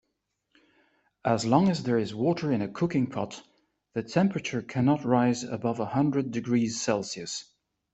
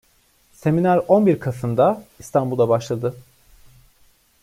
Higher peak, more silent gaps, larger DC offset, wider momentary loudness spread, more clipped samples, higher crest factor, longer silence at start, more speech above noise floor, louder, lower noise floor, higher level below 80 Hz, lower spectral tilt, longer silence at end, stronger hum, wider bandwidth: second, -8 dBFS vs -4 dBFS; neither; neither; about the same, 11 LU vs 10 LU; neither; about the same, 20 dB vs 18 dB; first, 1.25 s vs 0.65 s; first, 53 dB vs 40 dB; second, -28 LUFS vs -20 LUFS; first, -79 dBFS vs -59 dBFS; second, -64 dBFS vs -56 dBFS; second, -6 dB/octave vs -8 dB/octave; second, 0.5 s vs 1.2 s; neither; second, 8.4 kHz vs 16 kHz